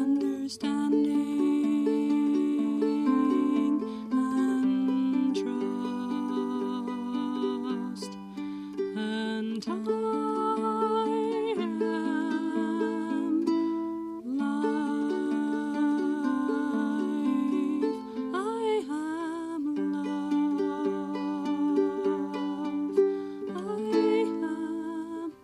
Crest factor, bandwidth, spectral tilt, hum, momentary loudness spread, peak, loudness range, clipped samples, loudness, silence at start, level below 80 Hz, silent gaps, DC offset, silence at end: 16 dB; 11 kHz; -6 dB/octave; none; 7 LU; -12 dBFS; 5 LU; under 0.1%; -29 LUFS; 0 s; -72 dBFS; none; under 0.1%; 0.1 s